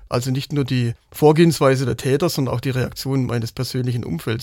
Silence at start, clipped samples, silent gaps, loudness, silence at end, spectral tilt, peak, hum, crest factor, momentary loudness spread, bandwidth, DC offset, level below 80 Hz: 0 s; under 0.1%; none; -20 LUFS; 0 s; -6.5 dB/octave; -2 dBFS; none; 18 dB; 9 LU; 17 kHz; under 0.1%; -48 dBFS